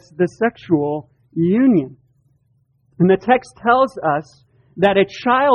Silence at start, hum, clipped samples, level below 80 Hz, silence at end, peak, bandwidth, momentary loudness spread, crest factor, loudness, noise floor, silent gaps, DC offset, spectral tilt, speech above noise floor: 0.2 s; none; under 0.1%; -56 dBFS; 0 s; -2 dBFS; 10 kHz; 9 LU; 16 dB; -17 LUFS; -61 dBFS; none; under 0.1%; -7.5 dB/octave; 45 dB